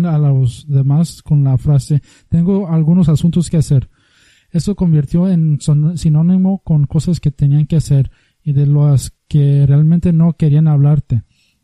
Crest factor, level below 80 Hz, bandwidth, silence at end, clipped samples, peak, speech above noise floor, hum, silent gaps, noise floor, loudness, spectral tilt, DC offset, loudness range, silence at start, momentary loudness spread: 10 dB; -36 dBFS; 11.5 kHz; 0.45 s; under 0.1%; -2 dBFS; 40 dB; none; none; -52 dBFS; -13 LUFS; -8.5 dB/octave; under 0.1%; 2 LU; 0 s; 7 LU